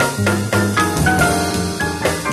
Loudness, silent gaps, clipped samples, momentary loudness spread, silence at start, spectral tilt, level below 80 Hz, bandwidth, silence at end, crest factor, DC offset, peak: -17 LUFS; none; under 0.1%; 5 LU; 0 s; -4.5 dB/octave; -34 dBFS; 13 kHz; 0 s; 16 dB; under 0.1%; -2 dBFS